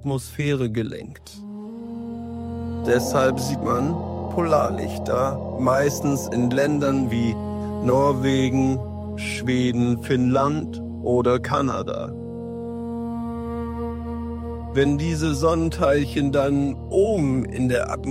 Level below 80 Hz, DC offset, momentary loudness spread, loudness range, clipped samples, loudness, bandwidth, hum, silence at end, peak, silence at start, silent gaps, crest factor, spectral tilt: -40 dBFS; under 0.1%; 12 LU; 5 LU; under 0.1%; -23 LUFS; 16 kHz; none; 0 s; -6 dBFS; 0 s; none; 16 dB; -6.5 dB/octave